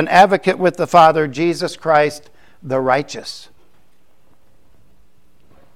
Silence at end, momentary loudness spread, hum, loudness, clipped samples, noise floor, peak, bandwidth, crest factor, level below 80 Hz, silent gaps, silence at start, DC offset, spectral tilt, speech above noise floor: 2.35 s; 18 LU; none; -15 LUFS; under 0.1%; -59 dBFS; 0 dBFS; 15.5 kHz; 18 dB; -56 dBFS; none; 0 s; 0.8%; -5 dB/octave; 44 dB